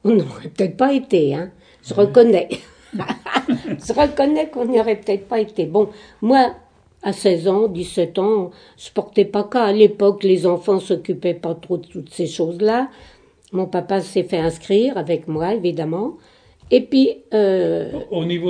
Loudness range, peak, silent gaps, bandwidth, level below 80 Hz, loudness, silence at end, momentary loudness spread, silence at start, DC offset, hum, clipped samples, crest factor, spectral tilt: 4 LU; 0 dBFS; none; 10 kHz; -52 dBFS; -19 LUFS; 0 s; 12 LU; 0.05 s; under 0.1%; none; under 0.1%; 18 dB; -6.5 dB/octave